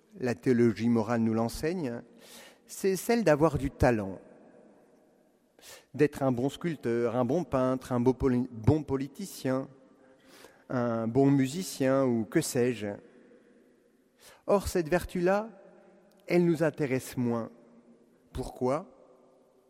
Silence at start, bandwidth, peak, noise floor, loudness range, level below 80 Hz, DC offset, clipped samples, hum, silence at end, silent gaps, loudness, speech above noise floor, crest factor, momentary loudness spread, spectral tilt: 0.15 s; 16 kHz; -8 dBFS; -66 dBFS; 3 LU; -52 dBFS; under 0.1%; under 0.1%; none; 0.85 s; none; -29 LUFS; 37 dB; 22 dB; 16 LU; -6.5 dB/octave